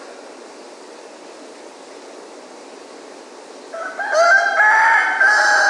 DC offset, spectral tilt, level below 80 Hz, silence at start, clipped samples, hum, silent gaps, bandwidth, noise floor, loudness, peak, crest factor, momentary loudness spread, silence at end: under 0.1%; 1 dB/octave; under -90 dBFS; 0 s; under 0.1%; none; none; 11.5 kHz; -38 dBFS; -13 LUFS; -4 dBFS; 16 dB; 26 LU; 0 s